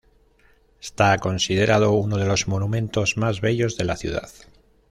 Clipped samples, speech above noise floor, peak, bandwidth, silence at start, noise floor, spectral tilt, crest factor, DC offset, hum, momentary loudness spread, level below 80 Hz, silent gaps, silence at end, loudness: under 0.1%; 36 dB; -4 dBFS; 12.5 kHz; 0.85 s; -57 dBFS; -5 dB/octave; 18 dB; under 0.1%; none; 10 LU; -46 dBFS; none; 0.6 s; -21 LUFS